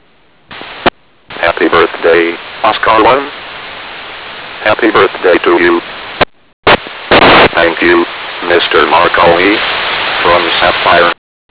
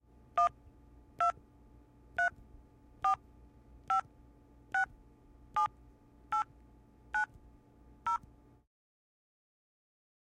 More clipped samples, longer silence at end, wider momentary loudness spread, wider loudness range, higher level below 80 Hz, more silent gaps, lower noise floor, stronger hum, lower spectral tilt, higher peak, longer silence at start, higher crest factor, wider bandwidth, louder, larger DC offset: neither; second, 0.35 s vs 2.05 s; first, 17 LU vs 6 LU; about the same, 4 LU vs 5 LU; first, -38 dBFS vs -62 dBFS; first, 6.53-6.63 s vs none; second, -48 dBFS vs -61 dBFS; second, none vs 60 Hz at -65 dBFS; first, -8 dB/octave vs -3.5 dB/octave; first, 0 dBFS vs -18 dBFS; first, 0.5 s vs 0.35 s; second, 10 dB vs 20 dB; second, 4 kHz vs 11 kHz; first, -9 LUFS vs -35 LUFS; first, 0.4% vs under 0.1%